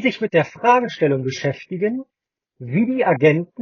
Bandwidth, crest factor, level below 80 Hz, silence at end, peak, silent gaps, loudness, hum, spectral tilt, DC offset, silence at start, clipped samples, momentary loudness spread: 7 kHz; 18 dB; -66 dBFS; 0 s; -2 dBFS; none; -19 LUFS; none; -5.5 dB/octave; under 0.1%; 0 s; under 0.1%; 9 LU